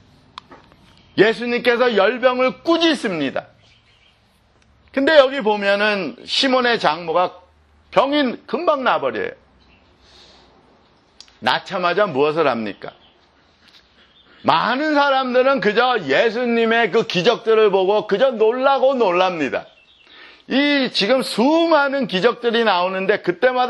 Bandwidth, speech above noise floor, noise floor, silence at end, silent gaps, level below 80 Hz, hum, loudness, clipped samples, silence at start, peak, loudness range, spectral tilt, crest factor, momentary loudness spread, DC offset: 12 kHz; 40 dB; -57 dBFS; 0 s; none; -62 dBFS; none; -17 LUFS; under 0.1%; 0.5 s; 0 dBFS; 6 LU; -5 dB/octave; 18 dB; 8 LU; under 0.1%